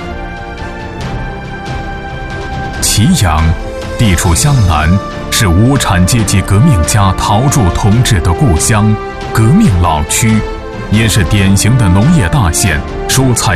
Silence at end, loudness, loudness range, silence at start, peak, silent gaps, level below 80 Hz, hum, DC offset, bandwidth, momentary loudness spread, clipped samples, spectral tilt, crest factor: 0 s; -10 LUFS; 4 LU; 0 s; 0 dBFS; none; -22 dBFS; none; 0.5%; 14.5 kHz; 13 LU; under 0.1%; -5 dB/octave; 10 dB